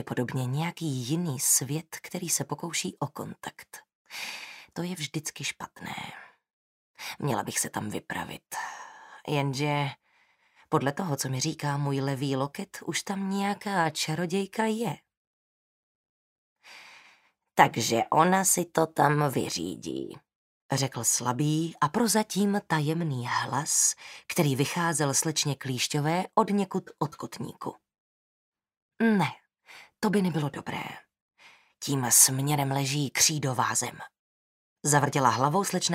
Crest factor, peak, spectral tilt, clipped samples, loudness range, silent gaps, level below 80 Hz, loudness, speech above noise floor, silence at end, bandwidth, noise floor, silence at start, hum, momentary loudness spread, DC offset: 26 dB; -4 dBFS; -3.5 dB/octave; under 0.1%; 9 LU; 3.95-4.05 s, 6.50-6.94 s, 15.17-16.56 s, 20.35-20.69 s, 28.00-28.52 s, 28.77-28.89 s, 31.21-31.29 s, 34.19-34.76 s; -70 dBFS; -27 LUFS; 39 dB; 0 s; 16 kHz; -66 dBFS; 0 s; none; 15 LU; under 0.1%